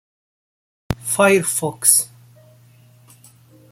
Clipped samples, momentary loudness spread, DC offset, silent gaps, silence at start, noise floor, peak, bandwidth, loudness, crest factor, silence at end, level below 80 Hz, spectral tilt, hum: under 0.1%; 15 LU; under 0.1%; none; 0.9 s; -50 dBFS; 0 dBFS; 16.5 kHz; -16 LUFS; 22 dB; 1.65 s; -48 dBFS; -3 dB/octave; none